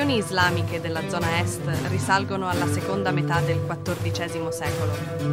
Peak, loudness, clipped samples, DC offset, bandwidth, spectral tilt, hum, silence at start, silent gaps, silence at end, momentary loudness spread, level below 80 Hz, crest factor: -6 dBFS; -25 LUFS; under 0.1%; under 0.1%; 16 kHz; -5 dB/octave; none; 0 s; none; 0 s; 6 LU; -50 dBFS; 18 dB